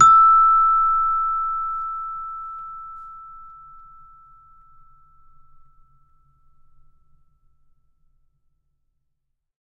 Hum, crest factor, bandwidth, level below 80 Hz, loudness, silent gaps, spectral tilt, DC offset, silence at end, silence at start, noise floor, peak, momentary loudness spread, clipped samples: none; 20 dB; 7.4 kHz; -48 dBFS; -17 LUFS; none; -2 dB/octave; under 0.1%; 6.15 s; 0 s; -74 dBFS; -2 dBFS; 27 LU; under 0.1%